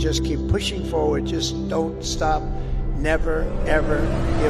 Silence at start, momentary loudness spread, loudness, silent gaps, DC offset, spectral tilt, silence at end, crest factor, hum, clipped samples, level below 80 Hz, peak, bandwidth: 0 s; 4 LU; -23 LUFS; none; under 0.1%; -5.5 dB/octave; 0 s; 16 dB; none; under 0.1%; -26 dBFS; -6 dBFS; 13 kHz